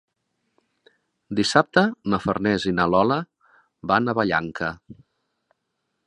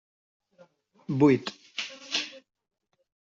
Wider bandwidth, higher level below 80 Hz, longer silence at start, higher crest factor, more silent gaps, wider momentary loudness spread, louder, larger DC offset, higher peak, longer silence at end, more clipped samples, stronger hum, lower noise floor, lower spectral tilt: first, 10.5 kHz vs 7.6 kHz; first, -54 dBFS vs -70 dBFS; first, 1.3 s vs 1.1 s; about the same, 24 dB vs 22 dB; neither; second, 11 LU vs 15 LU; first, -22 LUFS vs -27 LUFS; neither; first, 0 dBFS vs -8 dBFS; first, 1.15 s vs 1 s; neither; neither; first, -77 dBFS vs -60 dBFS; about the same, -5.5 dB/octave vs -5.5 dB/octave